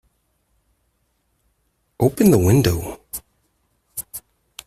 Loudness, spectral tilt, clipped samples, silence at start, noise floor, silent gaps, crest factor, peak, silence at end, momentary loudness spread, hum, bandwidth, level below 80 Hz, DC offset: -18 LUFS; -6.5 dB/octave; under 0.1%; 2 s; -68 dBFS; none; 20 dB; -2 dBFS; 0.5 s; 20 LU; none; 16 kHz; -46 dBFS; under 0.1%